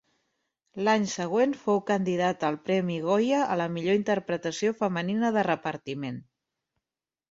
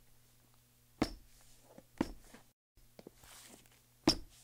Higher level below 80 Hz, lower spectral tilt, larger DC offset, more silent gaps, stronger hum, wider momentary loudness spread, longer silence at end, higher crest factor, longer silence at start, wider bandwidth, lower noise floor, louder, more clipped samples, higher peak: second, -70 dBFS vs -58 dBFS; first, -5.5 dB/octave vs -4 dB/octave; neither; second, none vs 2.53-2.75 s; neither; second, 9 LU vs 27 LU; first, 1.1 s vs 0.2 s; second, 18 dB vs 28 dB; second, 0.75 s vs 1 s; second, 8 kHz vs 16 kHz; first, under -90 dBFS vs -67 dBFS; first, -27 LUFS vs -38 LUFS; neither; first, -10 dBFS vs -16 dBFS